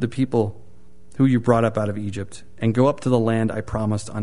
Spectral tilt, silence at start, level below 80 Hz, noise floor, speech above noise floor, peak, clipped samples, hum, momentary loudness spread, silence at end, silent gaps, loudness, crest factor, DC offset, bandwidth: -7.5 dB/octave; 0 s; -48 dBFS; -51 dBFS; 31 dB; -2 dBFS; under 0.1%; none; 11 LU; 0 s; none; -21 LUFS; 20 dB; 2%; 11 kHz